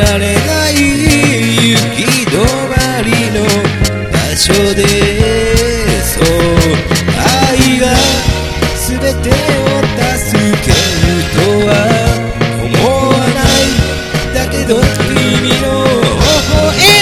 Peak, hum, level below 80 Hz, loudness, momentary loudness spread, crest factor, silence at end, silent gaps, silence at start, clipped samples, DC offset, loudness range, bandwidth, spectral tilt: 0 dBFS; none; -20 dBFS; -10 LUFS; 5 LU; 10 dB; 0 s; none; 0 s; 0.9%; 0.7%; 1 LU; over 20 kHz; -4 dB/octave